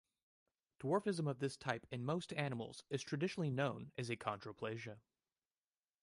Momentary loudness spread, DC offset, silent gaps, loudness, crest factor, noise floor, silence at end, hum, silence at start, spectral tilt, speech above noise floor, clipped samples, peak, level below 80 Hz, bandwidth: 8 LU; under 0.1%; none; -42 LUFS; 22 dB; under -90 dBFS; 1.05 s; none; 0.8 s; -6 dB/octave; over 48 dB; under 0.1%; -22 dBFS; -78 dBFS; 11.5 kHz